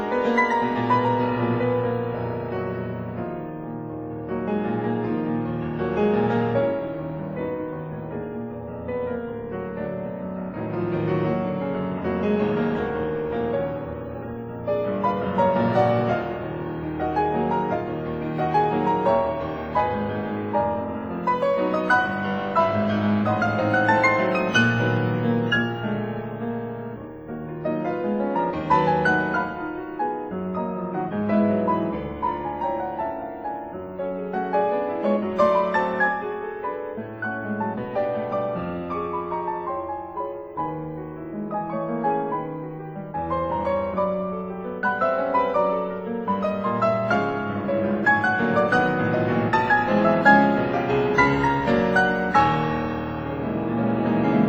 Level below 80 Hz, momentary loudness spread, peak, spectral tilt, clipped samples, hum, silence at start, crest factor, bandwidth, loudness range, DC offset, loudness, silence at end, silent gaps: -50 dBFS; 12 LU; -2 dBFS; -7.5 dB/octave; under 0.1%; none; 0 s; 20 dB; over 20 kHz; 9 LU; under 0.1%; -24 LUFS; 0 s; none